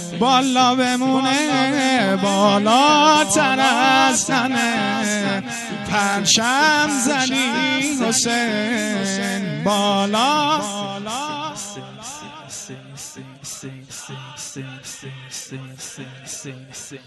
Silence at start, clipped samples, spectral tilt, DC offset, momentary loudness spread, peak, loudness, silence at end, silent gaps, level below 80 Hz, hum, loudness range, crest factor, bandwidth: 0 s; under 0.1%; -3 dB/octave; under 0.1%; 19 LU; -2 dBFS; -17 LUFS; 0.05 s; none; -60 dBFS; none; 17 LU; 18 dB; 12 kHz